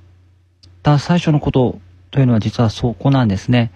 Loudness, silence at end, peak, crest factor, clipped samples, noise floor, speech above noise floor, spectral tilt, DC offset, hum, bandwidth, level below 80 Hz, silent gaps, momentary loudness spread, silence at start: -16 LUFS; 0.05 s; -2 dBFS; 14 dB; under 0.1%; -51 dBFS; 36 dB; -7.5 dB/octave; under 0.1%; none; 8.6 kHz; -40 dBFS; none; 6 LU; 0.85 s